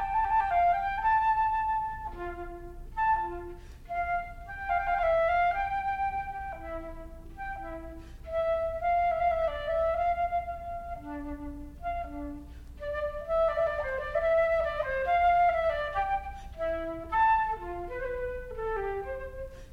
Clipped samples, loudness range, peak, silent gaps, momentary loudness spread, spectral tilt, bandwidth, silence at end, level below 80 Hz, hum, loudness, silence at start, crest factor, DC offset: under 0.1%; 6 LU; -16 dBFS; none; 16 LU; -6.5 dB/octave; 7.2 kHz; 0 s; -44 dBFS; none; -30 LUFS; 0 s; 14 dB; under 0.1%